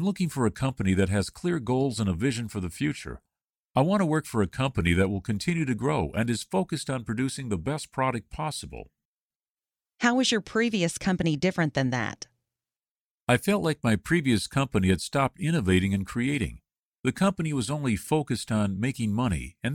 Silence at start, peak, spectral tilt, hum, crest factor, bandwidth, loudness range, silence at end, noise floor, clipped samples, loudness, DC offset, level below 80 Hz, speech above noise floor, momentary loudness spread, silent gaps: 0 s; -8 dBFS; -5.5 dB/octave; none; 20 dB; 17 kHz; 4 LU; 0 s; under -90 dBFS; under 0.1%; -27 LUFS; under 0.1%; -48 dBFS; over 64 dB; 8 LU; 3.44-3.48 s, 3.58-3.70 s, 9.05-9.30 s, 9.36-9.40 s, 9.50-9.55 s, 12.90-13.27 s, 16.79-16.92 s, 16.99-17.03 s